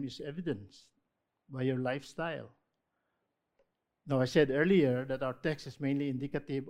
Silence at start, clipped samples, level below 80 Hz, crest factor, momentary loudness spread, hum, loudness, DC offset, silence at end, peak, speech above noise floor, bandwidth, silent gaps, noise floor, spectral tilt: 0 s; under 0.1%; -66 dBFS; 22 dB; 13 LU; none; -33 LUFS; under 0.1%; 0 s; -12 dBFS; 51 dB; 13 kHz; none; -83 dBFS; -7 dB/octave